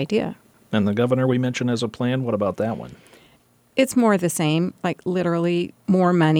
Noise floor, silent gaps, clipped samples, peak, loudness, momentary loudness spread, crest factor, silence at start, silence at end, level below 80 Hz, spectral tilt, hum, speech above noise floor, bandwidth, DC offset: -58 dBFS; none; under 0.1%; -6 dBFS; -22 LUFS; 8 LU; 16 dB; 0 s; 0 s; -62 dBFS; -6 dB/octave; none; 37 dB; 17 kHz; under 0.1%